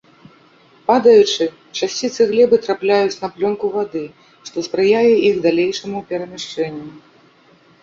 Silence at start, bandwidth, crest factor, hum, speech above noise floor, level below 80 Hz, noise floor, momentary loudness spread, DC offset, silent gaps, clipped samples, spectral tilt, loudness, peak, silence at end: 0.9 s; 7.6 kHz; 16 dB; none; 35 dB; -60 dBFS; -51 dBFS; 15 LU; under 0.1%; none; under 0.1%; -4.5 dB/octave; -17 LUFS; -2 dBFS; 0.85 s